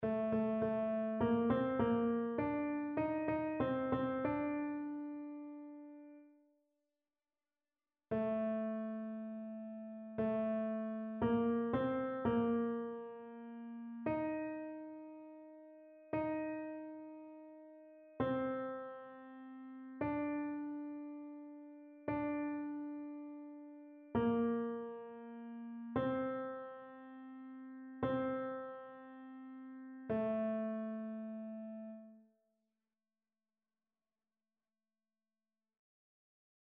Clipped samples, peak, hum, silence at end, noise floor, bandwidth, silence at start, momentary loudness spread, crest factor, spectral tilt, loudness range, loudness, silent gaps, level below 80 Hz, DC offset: under 0.1%; -22 dBFS; none; 4.55 s; under -90 dBFS; 4 kHz; 0 s; 18 LU; 18 dB; -7 dB/octave; 9 LU; -40 LUFS; none; -70 dBFS; under 0.1%